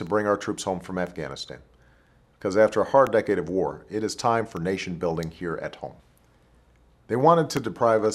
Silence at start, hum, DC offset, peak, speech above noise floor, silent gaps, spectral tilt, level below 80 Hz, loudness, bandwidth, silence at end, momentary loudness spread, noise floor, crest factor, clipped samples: 0 s; none; under 0.1%; -4 dBFS; 35 dB; none; -5.5 dB/octave; -56 dBFS; -25 LUFS; 14.5 kHz; 0 s; 15 LU; -59 dBFS; 20 dB; under 0.1%